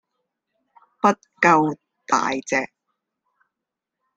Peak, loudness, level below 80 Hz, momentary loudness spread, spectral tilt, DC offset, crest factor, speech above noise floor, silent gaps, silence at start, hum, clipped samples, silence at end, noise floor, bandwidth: -2 dBFS; -20 LUFS; -68 dBFS; 10 LU; -4.5 dB/octave; under 0.1%; 22 dB; 65 dB; none; 1.05 s; none; under 0.1%; 1.5 s; -84 dBFS; 9.2 kHz